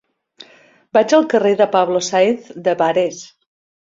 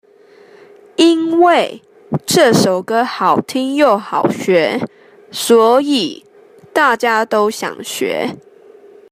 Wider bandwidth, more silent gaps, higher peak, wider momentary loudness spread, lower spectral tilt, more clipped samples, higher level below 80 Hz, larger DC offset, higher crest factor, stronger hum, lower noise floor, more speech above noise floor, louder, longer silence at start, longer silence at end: second, 7.8 kHz vs 15.5 kHz; neither; about the same, -2 dBFS vs 0 dBFS; second, 8 LU vs 12 LU; about the same, -4 dB/octave vs -4 dB/octave; neither; about the same, -64 dBFS vs -60 dBFS; neither; about the same, 16 dB vs 14 dB; neither; first, -50 dBFS vs -45 dBFS; about the same, 34 dB vs 31 dB; about the same, -16 LUFS vs -14 LUFS; about the same, 0.95 s vs 1 s; about the same, 0.75 s vs 0.75 s